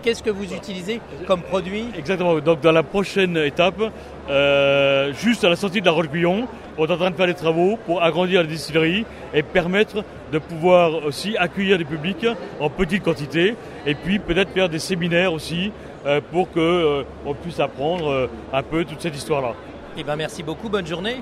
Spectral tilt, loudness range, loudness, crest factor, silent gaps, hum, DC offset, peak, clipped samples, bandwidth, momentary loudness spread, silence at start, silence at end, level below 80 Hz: -5.5 dB/octave; 4 LU; -21 LUFS; 20 dB; none; none; under 0.1%; 0 dBFS; under 0.1%; 14 kHz; 11 LU; 0 s; 0 s; -46 dBFS